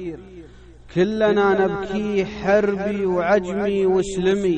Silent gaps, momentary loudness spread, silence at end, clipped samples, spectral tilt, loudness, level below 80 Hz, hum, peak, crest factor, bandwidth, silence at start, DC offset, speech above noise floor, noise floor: none; 6 LU; 0 s; under 0.1%; -6.5 dB/octave; -20 LUFS; -46 dBFS; none; -6 dBFS; 14 dB; 9.2 kHz; 0 s; under 0.1%; 23 dB; -43 dBFS